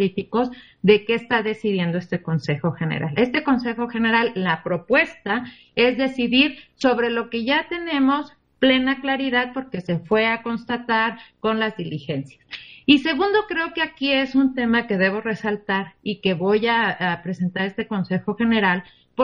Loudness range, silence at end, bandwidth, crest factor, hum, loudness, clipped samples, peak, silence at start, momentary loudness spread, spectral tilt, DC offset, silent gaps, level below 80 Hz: 2 LU; 0 s; 7.6 kHz; 20 dB; none; -21 LUFS; under 0.1%; -2 dBFS; 0 s; 9 LU; -7 dB/octave; under 0.1%; none; -56 dBFS